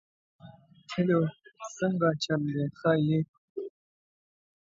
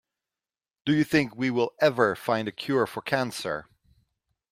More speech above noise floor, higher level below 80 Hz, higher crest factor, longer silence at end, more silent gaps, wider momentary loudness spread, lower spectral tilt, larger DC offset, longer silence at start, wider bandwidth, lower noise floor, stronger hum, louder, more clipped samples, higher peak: second, 26 dB vs over 64 dB; about the same, -68 dBFS vs -66 dBFS; about the same, 20 dB vs 22 dB; about the same, 1 s vs 0.9 s; first, 3.28-3.55 s vs none; first, 15 LU vs 10 LU; about the same, -6.5 dB/octave vs -5.5 dB/octave; neither; second, 0.45 s vs 0.85 s; second, 7.8 kHz vs 16 kHz; second, -53 dBFS vs under -90 dBFS; neither; second, -29 LUFS vs -26 LUFS; neither; second, -12 dBFS vs -6 dBFS